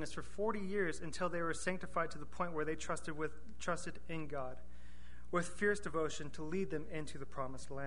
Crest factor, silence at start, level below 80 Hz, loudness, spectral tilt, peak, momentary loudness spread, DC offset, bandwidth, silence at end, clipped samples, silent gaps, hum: 20 dB; 0 s; -58 dBFS; -41 LUFS; -5 dB/octave; -20 dBFS; 9 LU; 1%; 10.5 kHz; 0 s; under 0.1%; none; none